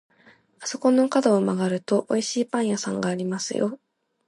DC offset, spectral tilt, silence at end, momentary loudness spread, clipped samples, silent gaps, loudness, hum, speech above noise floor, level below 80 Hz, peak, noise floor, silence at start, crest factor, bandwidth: under 0.1%; -5 dB/octave; 0.5 s; 9 LU; under 0.1%; none; -24 LUFS; none; 34 dB; -74 dBFS; -6 dBFS; -57 dBFS; 0.6 s; 18 dB; 11.5 kHz